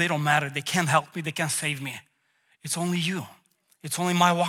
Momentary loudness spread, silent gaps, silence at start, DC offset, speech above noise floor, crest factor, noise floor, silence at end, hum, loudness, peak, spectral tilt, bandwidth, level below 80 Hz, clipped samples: 17 LU; none; 0 s; under 0.1%; 42 dB; 22 dB; -68 dBFS; 0 s; none; -26 LUFS; -6 dBFS; -4 dB/octave; 17 kHz; -72 dBFS; under 0.1%